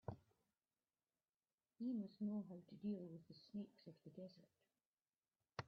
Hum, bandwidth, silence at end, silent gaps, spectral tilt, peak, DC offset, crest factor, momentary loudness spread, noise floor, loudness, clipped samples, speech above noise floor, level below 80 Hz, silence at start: none; 6.4 kHz; 0 s; 1.29-1.33 s, 1.54-1.58 s, 4.86-4.93 s; -7 dB/octave; -32 dBFS; under 0.1%; 22 dB; 14 LU; under -90 dBFS; -52 LUFS; under 0.1%; over 39 dB; -82 dBFS; 0.05 s